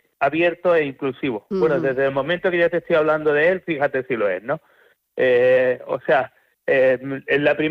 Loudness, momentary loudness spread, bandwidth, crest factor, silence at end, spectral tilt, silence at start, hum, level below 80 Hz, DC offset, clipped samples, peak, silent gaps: -20 LUFS; 8 LU; 5.6 kHz; 14 dB; 0 s; -7.5 dB/octave; 0.2 s; none; -60 dBFS; under 0.1%; under 0.1%; -6 dBFS; none